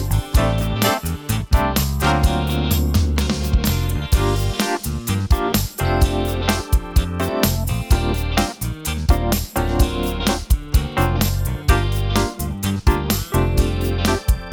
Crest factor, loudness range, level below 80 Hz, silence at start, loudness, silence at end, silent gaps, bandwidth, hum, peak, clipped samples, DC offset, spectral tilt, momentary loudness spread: 16 dB; 1 LU; -22 dBFS; 0 s; -20 LUFS; 0 s; none; over 20 kHz; none; -2 dBFS; under 0.1%; under 0.1%; -5 dB/octave; 4 LU